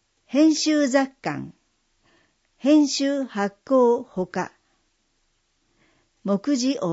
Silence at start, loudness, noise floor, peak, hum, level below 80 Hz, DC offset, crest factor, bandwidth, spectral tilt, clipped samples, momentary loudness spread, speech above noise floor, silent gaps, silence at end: 0.3 s; -22 LUFS; -69 dBFS; -6 dBFS; none; -68 dBFS; under 0.1%; 16 dB; 8 kHz; -4.5 dB/octave; under 0.1%; 12 LU; 48 dB; none; 0 s